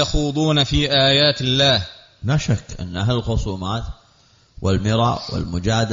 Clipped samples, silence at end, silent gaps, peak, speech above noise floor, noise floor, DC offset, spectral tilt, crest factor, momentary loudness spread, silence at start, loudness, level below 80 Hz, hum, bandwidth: under 0.1%; 0 s; none; -4 dBFS; 36 dB; -55 dBFS; under 0.1%; -4 dB/octave; 14 dB; 12 LU; 0 s; -19 LUFS; -34 dBFS; none; 7.6 kHz